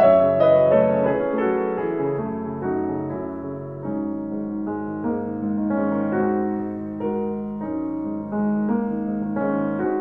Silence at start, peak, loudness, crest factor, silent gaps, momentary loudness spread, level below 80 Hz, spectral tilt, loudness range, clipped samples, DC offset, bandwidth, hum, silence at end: 0 s; -6 dBFS; -23 LUFS; 16 dB; none; 12 LU; -58 dBFS; -11 dB/octave; 6 LU; under 0.1%; 0.2%; 4.2 kHz; none; 0 s